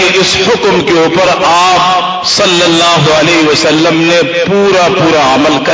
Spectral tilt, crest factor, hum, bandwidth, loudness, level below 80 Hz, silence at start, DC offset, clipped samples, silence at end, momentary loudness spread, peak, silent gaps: -3.5 dB/octave; 8 dB; none; 8 kHz; -7 LUFS; -40 dBFS; 0 s; under 0.1%; under 0.1%; 0 s; 3 LU; 0 dBFS; none